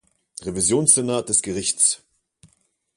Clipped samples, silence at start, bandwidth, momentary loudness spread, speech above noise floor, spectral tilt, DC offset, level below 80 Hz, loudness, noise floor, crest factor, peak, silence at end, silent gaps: under 0.1%; 0.4 s; 11.5 kHz; 16 LU; 45 dB; -3 dB/octave; under 0.1%; -54 dBFS; -18 LUFS; -65 dBFS; 22 dB; -2 dBFS; 1 s; none